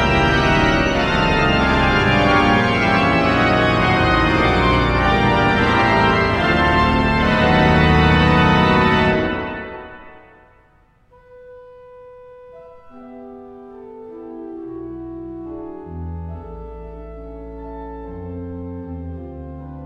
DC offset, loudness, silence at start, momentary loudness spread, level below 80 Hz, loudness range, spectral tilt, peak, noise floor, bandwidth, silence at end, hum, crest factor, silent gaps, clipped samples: under 0.1%; -15 LUFS; 0 s; 21 LU; -30 dBFS; 19 LU; -6.5 dB/octave; -2 dBFS; -54 dBFS; 11 kHz; 0 s; none; 16 dB; none; under 0.1%